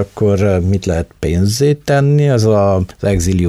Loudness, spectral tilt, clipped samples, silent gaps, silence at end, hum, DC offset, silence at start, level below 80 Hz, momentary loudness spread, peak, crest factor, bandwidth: -14 LUFS; -6.5 dB/octave; under 0.1%; none; 0 s; none; under 0.1%; 0 s; -30 dBFS; 5 LU; -2 dBFS; 10 dB; 14.5 kHz